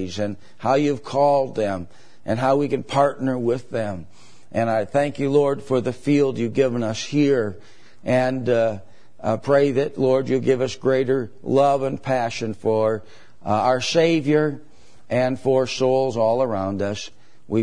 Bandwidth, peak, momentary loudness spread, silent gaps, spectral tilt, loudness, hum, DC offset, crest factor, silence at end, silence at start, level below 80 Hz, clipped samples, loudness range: 10.5 kHz; -4 dBFS; 10 LU; none; -6 dB/octave; -21 LUFS; none; 1%; 16 dB; 0 s; 0 s; -58 dBFS; under 0.1%; 2 LU